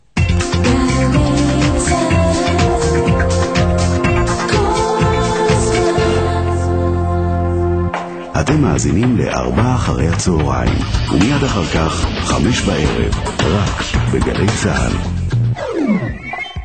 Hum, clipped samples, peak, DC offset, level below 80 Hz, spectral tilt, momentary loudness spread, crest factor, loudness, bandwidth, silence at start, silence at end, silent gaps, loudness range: none; under 0.1%; 0 dBFS; 0.2%; -24 dBFS; -5.5 dB/octave; 4 LU; 14 dB; -15 LUFS; 9.2 kHz; 0.15 s; 0 s; none; 2 LU